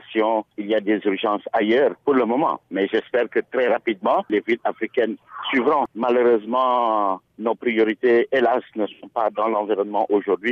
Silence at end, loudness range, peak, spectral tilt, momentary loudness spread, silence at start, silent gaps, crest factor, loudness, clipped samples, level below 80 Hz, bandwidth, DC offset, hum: 0 s; 2 LU; -8 dBFS; -7 dB/octave; 6 LU; 0.1 s; none; 12 dB; -21 LUFS; under 0.1%; -68 dBFS; 6 kHz; under 0.1%; none